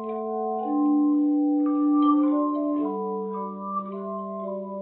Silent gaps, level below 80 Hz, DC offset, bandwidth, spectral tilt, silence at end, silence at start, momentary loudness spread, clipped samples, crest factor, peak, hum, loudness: none; -76 dBFS; under 0.1%; 3.3 kHz; -8.5 dB/octave; 0 s; 0 s; 12 LU; under 0.1%; 14 dB; -10 dBFS; none; -25 LUFS